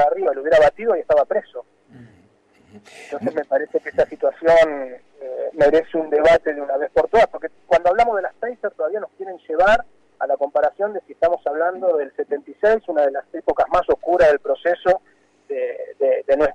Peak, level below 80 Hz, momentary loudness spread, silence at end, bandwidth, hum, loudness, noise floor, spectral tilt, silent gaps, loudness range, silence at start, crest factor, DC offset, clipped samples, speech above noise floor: -8 dBFS; -48 dBFS; 12 LU; 0 s; 9.4 kHz; none; -19 LUFS; -56 dBFS; -5 dB/octave; none; 3 LU; 0 s; 12 dB; under 0.1%; under 0.1%; 37 dB